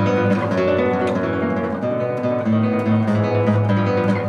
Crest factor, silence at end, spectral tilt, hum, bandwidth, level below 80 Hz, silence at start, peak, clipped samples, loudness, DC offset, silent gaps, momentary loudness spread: 12 dB; 0 s; -8.5 dB/octave; none; 7.2 kHz; -56 dBFS; 0 s; -6 dBFS; under 0.1%; -19 LUFS; under 0.1%; none; 4 LU